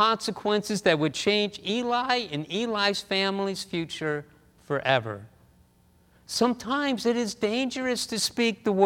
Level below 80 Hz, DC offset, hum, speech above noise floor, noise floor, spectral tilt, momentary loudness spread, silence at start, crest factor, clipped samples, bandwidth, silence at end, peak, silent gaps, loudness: -64 dBFS; under 0.1%; none; 35 dB; -61 dBFS; -4 dB/octave; 7 LU; 0 s; 22 dB; under 0.1%; 18 kHz; 0 s; -6 dBFS; none; -26 LUFS